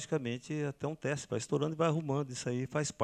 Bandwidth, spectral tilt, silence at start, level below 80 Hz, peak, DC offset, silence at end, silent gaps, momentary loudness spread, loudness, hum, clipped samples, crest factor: 11 kHz; -5.5 dB/octave; 0 s; -70 dBFS; -16 dBFS; under 0.1%; 0 s; none; 6 LU; -35 LUFS; none; under 0.1%; 18 dB